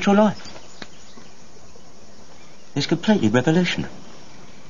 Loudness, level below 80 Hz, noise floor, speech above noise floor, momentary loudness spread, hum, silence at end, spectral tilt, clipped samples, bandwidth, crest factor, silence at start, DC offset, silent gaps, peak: -20 LUFS; -56 dBFS; -48 dBFS; 29 dB; 23 LU; none; 0.7 s; -6 dB/octave; under 0.1%; 7.4 kHz; 20 dB; 0 s; 2%; none; -4 dBFS